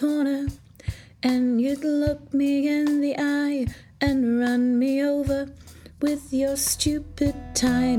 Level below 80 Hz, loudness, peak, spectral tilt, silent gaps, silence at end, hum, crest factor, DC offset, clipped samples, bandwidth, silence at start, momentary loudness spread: -42 dBFS; -24 LUFS; -10 dBFS; -4.5 dB/octave; none; 0 s; none; 14 dB; under 0.1%; under 0.1%; 17.5 kHz; 0 s; 7 LU